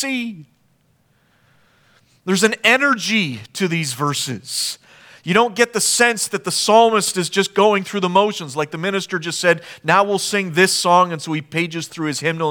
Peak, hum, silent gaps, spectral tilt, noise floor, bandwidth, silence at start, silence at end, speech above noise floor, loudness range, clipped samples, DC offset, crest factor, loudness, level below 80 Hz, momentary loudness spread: 0 dBFS; none; none; -3 dB/octave; -60 dBFS; over 20 kHz; 0 s; 0 s; 42 dB; 3 LU; under 0.1%; under 0.1%; 18 dB; -17 LUFS; -68 dBFS; 10 LU